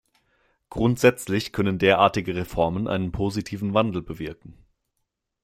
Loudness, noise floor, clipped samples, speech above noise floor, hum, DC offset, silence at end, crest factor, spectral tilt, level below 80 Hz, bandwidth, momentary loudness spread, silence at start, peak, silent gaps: -23 LUFS; -79 dBFS; under 0.1%; 56 dB; none; under 0.1%; 0.9 s; 22 dB; -6 dB/octave; -48 dBFS; 16.5 kHz; 13 LU; 0.7 s; -2 dBFS; none